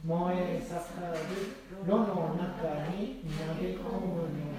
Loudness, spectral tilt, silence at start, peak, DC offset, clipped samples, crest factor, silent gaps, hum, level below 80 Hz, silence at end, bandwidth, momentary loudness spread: -34 LUFS; -7.5 dB/octave; 0 s; -14 dBFS; under 0.1%; under 0.1%; 18 dB; none; none; -52 dBFS; 0 s; 15.5 kHz; 8 LU